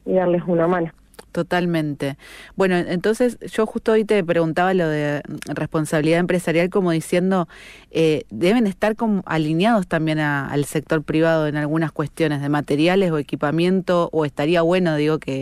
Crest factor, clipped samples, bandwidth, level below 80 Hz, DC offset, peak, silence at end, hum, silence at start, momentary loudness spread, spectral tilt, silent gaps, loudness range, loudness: 12 dB; under 0.1%; 14.5 kHz; -52 dBFS; under 0.1%; -8 dBFS; 0 s; none; 0.05 s; 6 LU; -6.5 dB/octave; none; 1 LU; -20 LUFS